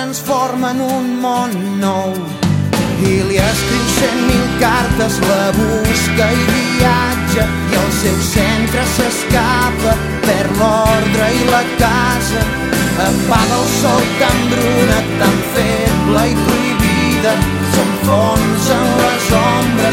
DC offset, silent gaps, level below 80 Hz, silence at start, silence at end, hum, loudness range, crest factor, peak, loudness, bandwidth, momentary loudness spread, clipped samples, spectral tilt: under 0.1%; none; -26 dBFS; 0 s; 0 s; none; 1 LU; 14 dB; 0 dBFS; -13 LUFS; 16.5 kHz; 4 LU; under 0.1%; -4.5 dB/octave